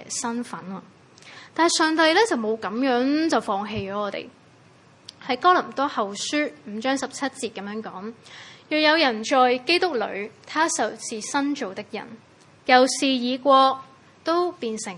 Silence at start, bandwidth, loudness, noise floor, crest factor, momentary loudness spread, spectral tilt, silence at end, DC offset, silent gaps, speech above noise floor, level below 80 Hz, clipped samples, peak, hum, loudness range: 0 s; 11.5 kHz; -22 LUFS; -53 dBFS; 24 dB; 18 LU; -2.5 dB/octave; 0 s; under 0.1%; none; 30 dB; -68 dBFS; under 0.1%; 0 dBFS; none; 4 LU